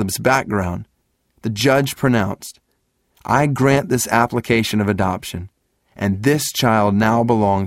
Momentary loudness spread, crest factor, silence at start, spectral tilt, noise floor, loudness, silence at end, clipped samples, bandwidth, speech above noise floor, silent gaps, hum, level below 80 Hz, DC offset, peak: 13 LU; 18 dB; 0 s; -5 dB/octave; -67 dBFS; -18 LUFS; 0 s; under 0.1%; 16.5 kHz; 50 dB; none; none; -46 dBFS; under 0.1%; 0 dBFS